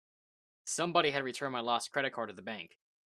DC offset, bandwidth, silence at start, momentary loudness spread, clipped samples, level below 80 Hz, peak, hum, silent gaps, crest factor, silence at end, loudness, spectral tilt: under 0.1%; 14 kHz; 0.65 s; 15 LU; under 0.1%; -80 dBFS; -12 dBFS; none; none; 24 dB; 0.4 s; -34 LUFS; -3 dB/octave